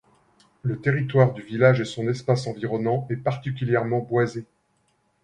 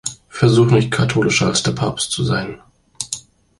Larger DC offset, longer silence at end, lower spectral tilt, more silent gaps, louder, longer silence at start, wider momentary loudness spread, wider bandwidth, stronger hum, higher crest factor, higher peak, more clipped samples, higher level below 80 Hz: neither; first, 0.8 s vs 0.4 s; first, -7.5 dB/octave vs -5 dB/octave; neither; second, -24 LUFS vs -17 LUFS; first, 0.65 s vs 0.05 s; second, 9 LU vs 14 LU; second, 10 kHz vs 11.5 kHz; neither; about the same, 20 dB vs 16 dB; about the same, -4 dBFS vs -2 dBFS; neither; second, -60 dBFS vs -44 dBFS